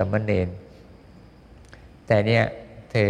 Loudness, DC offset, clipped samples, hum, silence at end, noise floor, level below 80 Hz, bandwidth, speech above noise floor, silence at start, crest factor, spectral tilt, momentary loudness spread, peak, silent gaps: -23 LUFS; under 0.1%; under 0.1%; none; 0 s; -48 dBFS; -52 dBFS; 9.4 kHz; 27 dB; 0 s; 20 dB; -7.5 dB/octave; 18 LU; -6 dBFS; none